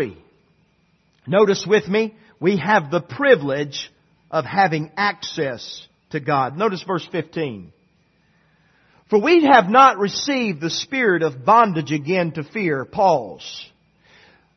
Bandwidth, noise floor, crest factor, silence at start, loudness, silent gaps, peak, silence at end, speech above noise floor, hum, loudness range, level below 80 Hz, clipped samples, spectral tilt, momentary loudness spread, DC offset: 6.4 kHz; -62 dBFS; 20 dB; 0 s; -19 LUFS; none; 0 dBFS; 0.9 s; 43 dB; none; 8 LU; -62 dBFS; under 0.1%; -5 dB/octave; 15 LU; under 0.1%